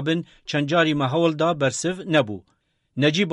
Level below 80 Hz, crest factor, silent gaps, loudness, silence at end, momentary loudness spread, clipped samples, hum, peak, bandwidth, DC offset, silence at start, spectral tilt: -60 dBFS; 16 dB; none; -22 LUFS; 0 s; 8 LU; under 0.1%; none; -6 dBFS; 11.5 kHz; under 0.1%; 0 s; -5 dB/octave